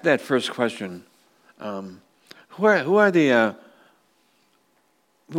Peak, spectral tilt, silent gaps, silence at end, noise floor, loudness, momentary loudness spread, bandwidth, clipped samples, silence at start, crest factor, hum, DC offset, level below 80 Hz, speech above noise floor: -4 dBFS; -5.5 dB/octave; none; 0 s; -66 dBFS; -21 LUFS; 19 LU; 16 kHz; under 0.1%; 0.05 s; 20 dB; none; under 0.1%; -78 dBFS; 45 dB